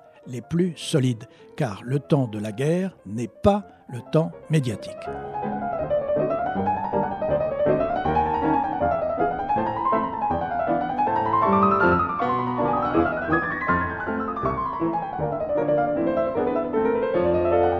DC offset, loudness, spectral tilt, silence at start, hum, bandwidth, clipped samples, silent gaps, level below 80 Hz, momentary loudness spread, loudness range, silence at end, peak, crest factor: under 0.1%; -24 LUFS; -7 dB/octave; 0.25 s; none; 13.5 kHz; under 0.1%; none; -48 dBFS; 8 LU; 4 LU; 0 s; -4 dBFS; 20 dB